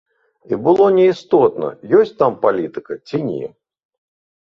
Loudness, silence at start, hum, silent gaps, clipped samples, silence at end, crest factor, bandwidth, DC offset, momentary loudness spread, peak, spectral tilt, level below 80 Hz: -16 LUFS; 0.5 s; none; none; under 0.1%; 0.95 s; 16 dB; 6.8 kHz; under 0.1%; 14 LU; -2 dBFS; -8 dB/octave; -60 dBFS